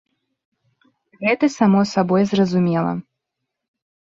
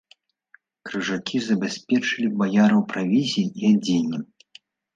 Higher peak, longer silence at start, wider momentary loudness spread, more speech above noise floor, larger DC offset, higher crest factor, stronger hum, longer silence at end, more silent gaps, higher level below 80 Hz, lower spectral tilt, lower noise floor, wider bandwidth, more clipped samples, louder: first, -2 dBFS vs -8 dBFS; first, 1.2 s vs 0.85 s; second, 8 LU vs 11 LU; first, 63 dB vs 38 dB; neither; about the same, 18 dB vs 16 dB; neither; first, 1.15 s vs 0.7 s; neither; first, -60 dBFS vs -68 dBFS; first, -7 dB/octave vs -5.5 dB/octave; first, -80 dBFS vs -59 dBFS; about the same, 7.6 kHz vs 7.8 kHz; neither; first, -18 LUFS vs -22 LUFS